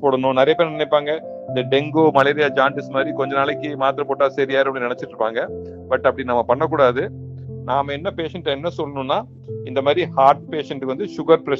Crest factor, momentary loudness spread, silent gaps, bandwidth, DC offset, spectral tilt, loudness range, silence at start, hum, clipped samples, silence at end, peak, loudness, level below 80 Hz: 20 dB; 10 LU; none; 7.2 kHz; under 0.1%; -7 dB/octave; 3 LU; 0 s; none; under 0.1%; 0 s; 0 dBFS; -19 LUFS; -56 dBFS